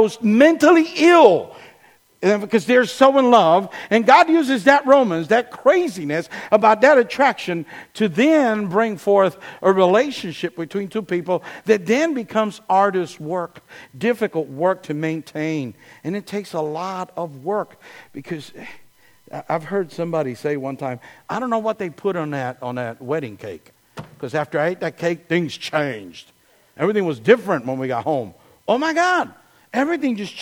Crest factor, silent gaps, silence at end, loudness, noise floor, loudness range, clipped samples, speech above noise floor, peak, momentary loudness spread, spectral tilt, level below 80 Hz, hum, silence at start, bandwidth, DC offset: 18 dB; none; 0 s; -19 LUFS; -53 dBFS; 12 LU; under 0.1%; 35 dB; 0 dBFS; 16 LU; -5.5 dB/octave; -66 dBFS; none; 0 s; 17 kHz; under 0.1%